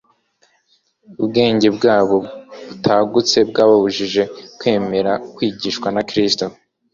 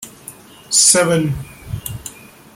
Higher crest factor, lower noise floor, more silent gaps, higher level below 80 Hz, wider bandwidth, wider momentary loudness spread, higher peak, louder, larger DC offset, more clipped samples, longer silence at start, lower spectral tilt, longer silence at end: about the same, 16 dB vs 18 dB; first, -61 dBFS vs -39 dBFS; neither; second, -54 dBFS vs -42 dBFS; second, 7.4 kHz vs 16.5 kHz; second, 10 LU vs 24 LU; about the same, -2 dBFS vs 0 dBFS; second, -16 LUFS vs -13 LUFS; neither; neither; first, 1.1 s vs 0 s; first, -4.5 dB/octave vs -2.5 dB/octave; about the same, 0.4 s vs 0.45 s